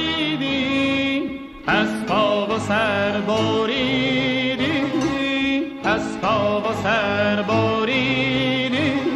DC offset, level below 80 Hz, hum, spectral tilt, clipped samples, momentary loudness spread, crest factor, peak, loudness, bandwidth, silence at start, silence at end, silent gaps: under 0.1%; -48 dBFS; none; -5.5 dB/octave; under 0.1%; 3 LU; 14 dB; -6 dBFS; -20 LUFS; 12 kHz; 0 s; 0 s; none